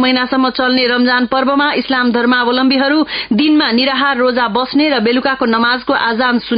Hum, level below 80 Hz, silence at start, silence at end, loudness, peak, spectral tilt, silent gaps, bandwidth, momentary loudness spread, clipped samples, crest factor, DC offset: none; -50 dBFS; 0 s; 0 s; -13 LUFS; -2 dBFS; -9.5 dB/octave; none; 5.2 kHz; 2 LU; under 0.1%; 12 dB; under 0.1%